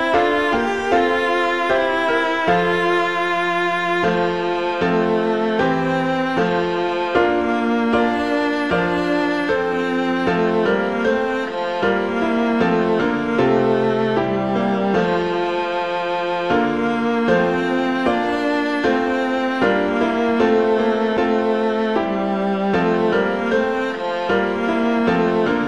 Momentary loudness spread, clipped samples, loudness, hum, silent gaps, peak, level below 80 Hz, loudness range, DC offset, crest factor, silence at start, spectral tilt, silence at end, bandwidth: 3 LU; under 0.1%; -19 LUFS; none; none; -4 dBFS; -48 dBFS; 1 LU; 0.4%; 16 dB; 0 s; -6.5 dB/octave; 0 s; 10.5 kHz